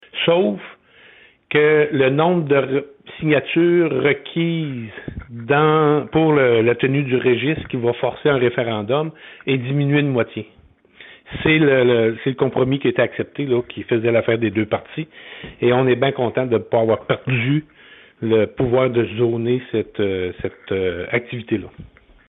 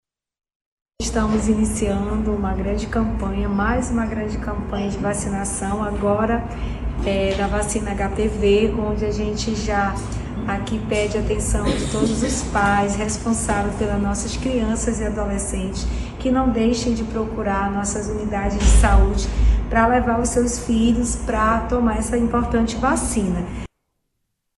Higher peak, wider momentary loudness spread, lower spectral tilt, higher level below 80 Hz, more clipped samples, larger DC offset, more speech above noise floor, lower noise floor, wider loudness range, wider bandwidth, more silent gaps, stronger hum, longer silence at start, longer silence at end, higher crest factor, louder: about the same, -2 dBFS vs -2 dBFS; first, 11 LU vs 7 LU; first, -11.5 dB/octave vs -5.5 dB/octave; second, -52 dBFS vs -26 dBFS; neither; neither; second, 31 dB vs 55 dB; second, -49 dBFS vs -74 dBFS; about the same, 3 LU vs 4 LU; second, 4 kHz vs 12 kHz; neither; neither; second, 0.15 s vs 1 s; second, 0.4 s vs 0.9 s; about the same, 18 dB vs 18 dB; first, -18 LUFS vs -21 LUFS